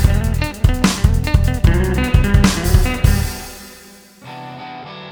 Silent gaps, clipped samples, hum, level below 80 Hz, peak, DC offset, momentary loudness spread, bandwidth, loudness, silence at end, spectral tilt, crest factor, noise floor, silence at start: none; under 0.1%; none; -18 dBFS; 0 dBFS; under 0.1%; 18 LU; over 20 kHz; -16 LUFS; 0 s; -5.5 dB/octave; 16 dB; -42 dBFS; 0 s